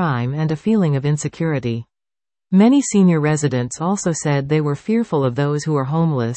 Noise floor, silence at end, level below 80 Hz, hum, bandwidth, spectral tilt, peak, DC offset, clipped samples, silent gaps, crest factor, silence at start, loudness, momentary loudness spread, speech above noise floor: under -90 dBFS; 0 s; -54 dBFS; none; 8.8 kHz; -6.5 dB/octave; -2 dBFS; under 0.1%; under 0.1%; none; 14 dB; 0 s; -18 LUFS; 7 LU; over 73 dB